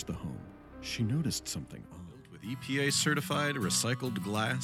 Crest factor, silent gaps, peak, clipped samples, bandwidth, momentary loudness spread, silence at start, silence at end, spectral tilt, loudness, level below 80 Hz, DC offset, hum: 18 dB; none; -16 dBFS; under 0.1%; 17.5 kHz; 19 LU; 0 s; 0 s; -3.5 dB/octave; -32 LUFS; -58 dBFS; under 0.1%; none